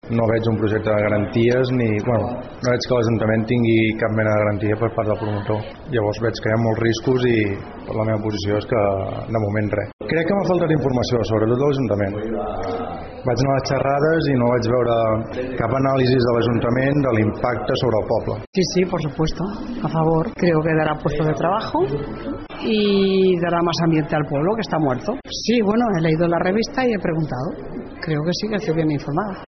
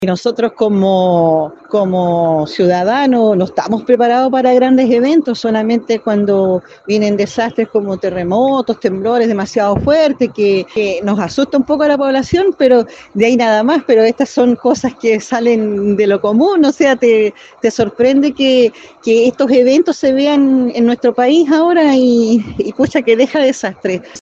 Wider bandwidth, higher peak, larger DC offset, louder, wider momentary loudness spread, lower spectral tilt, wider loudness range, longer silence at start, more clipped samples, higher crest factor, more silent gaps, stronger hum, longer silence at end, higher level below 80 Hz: second, 6.4 kHz vs 8 kHz; second, -6 dBFS vs 0 dBFS; neither; second, -20 LUFS vs -12 LUFS; about the same, 8 LU vs 6 LU; about the same, -6 dB/octave vs -6 dB/octave; about the same, 2 LU vs 3 LU; about the same, 0.05 s vs 0 s; neither; about the same, 14 dB vs 12 dB; first, 9.93-9.99 s, 18.47-18.53 s vs none; neither; about the same, 0 s vs 0 s; first, -42 dBFS vs -48 dBFS